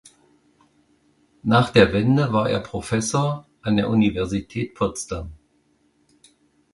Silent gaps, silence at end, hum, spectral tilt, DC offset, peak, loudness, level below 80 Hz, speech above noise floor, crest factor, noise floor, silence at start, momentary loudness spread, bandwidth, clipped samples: none; 1.4 s; none; -6 dB/octave; under 0.1%; 0 dBFS; -21 LUFS; -46 dBFS; 43 dB; 22 dB; -64 dBFS; 1.45 s; 14 LU; 11.5 kHz; under 0.1%